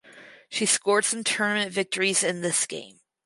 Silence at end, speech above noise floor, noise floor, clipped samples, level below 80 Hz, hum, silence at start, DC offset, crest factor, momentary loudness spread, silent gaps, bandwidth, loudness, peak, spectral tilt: 0.35 s; 24 dB; -50 dBFS; under 0.1%; -76 dBFS; none; 0.05 s; under 0.1%; 20 dB; 7 LU; none; 11.5 kHz; -24 LUFS; -6 dBFS; -1.5 dB/octave